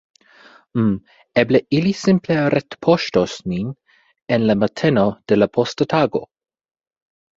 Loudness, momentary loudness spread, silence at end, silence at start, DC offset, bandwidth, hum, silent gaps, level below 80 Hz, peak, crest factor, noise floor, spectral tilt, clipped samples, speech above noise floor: -19 LUFS; 8 LU; 1.15 s; 0.75 s; under 0.1%; 7.8 kHz; none; none; -52 dBFS; -2 dBFS; 18 dB; -49 dBFS; -6.5 dB/octave; under 0.1%; 31 dB